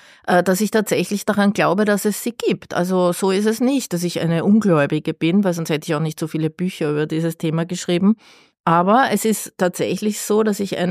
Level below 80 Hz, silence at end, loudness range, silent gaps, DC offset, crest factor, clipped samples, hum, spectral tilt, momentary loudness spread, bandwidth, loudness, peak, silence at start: -64 dBFS; 0 s; 2 LU; 8.60-8.64 s; under 0.1%; 14 dB; under 0.1%; none; -5.5 dB/octave; 7 LU; 15.5 kHz; -19 LUFS; -4 dBFS; 0.25 s